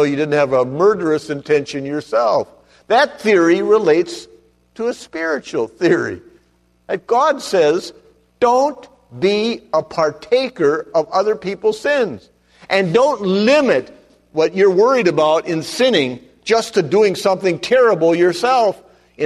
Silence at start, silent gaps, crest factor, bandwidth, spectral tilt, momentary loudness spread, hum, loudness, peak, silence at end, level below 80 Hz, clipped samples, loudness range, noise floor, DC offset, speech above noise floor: 0 s; none; 14 dB; 13 kHz; -5 dB/octave; 10 LU; none; -16 LUFS; -2 dBFS; 0 s; -58 dBFS; under 0.1%; 4 LU; -58 dBFS; under 0.1%; 42 dB